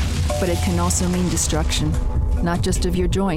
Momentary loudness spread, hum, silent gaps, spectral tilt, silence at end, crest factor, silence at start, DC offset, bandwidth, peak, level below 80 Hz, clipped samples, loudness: 3 LU; none; none; -5 dB/octave; 0 s; 14 dB; 0 s; under 0.1%; 16.5 kHz; -6 dBFS; -24 dBFS; under 0.1%; -21 LUFS